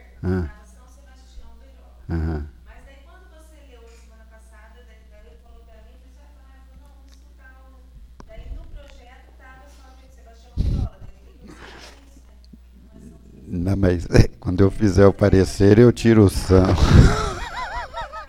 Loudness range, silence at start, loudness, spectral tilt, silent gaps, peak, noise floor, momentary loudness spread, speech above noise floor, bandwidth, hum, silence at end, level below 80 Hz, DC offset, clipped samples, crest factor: 19 LU; 0.25 s; -18 LUFS; -7.5 dB/octave; none; 0 dBFS; -46 dBFS; 26 LU; 31 dB; 13 kHz; none; 0.05 s; -30 dBFS; under 0.1%; under 0.1%; 22 dB